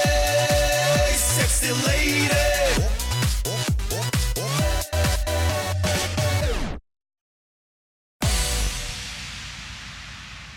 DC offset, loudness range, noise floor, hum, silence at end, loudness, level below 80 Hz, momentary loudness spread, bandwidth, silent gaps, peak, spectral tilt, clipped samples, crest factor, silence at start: under 0.1%; 9 LU; under -90 dBFS; none; 0 s; -22 LUFS; -28 dBFS; 15 LU; 18 kHz; 7.21-8.20 s; -12 dBFS; -3.5 dB/octave; under 0.1%; 12 dB; 0 s